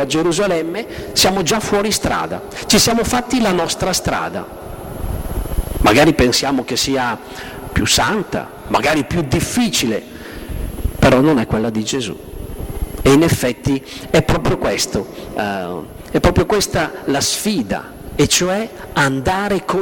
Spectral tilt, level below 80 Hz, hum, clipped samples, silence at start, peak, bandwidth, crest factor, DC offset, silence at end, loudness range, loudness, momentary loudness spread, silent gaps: -4 dB/octave; -30 dBFS; none; under 0.1%; 0 s; -4 dBFS; 18 kHz; 14 dB; under 0.1%; 0 s; 2 LU; -17 LUFS; 14 LU; none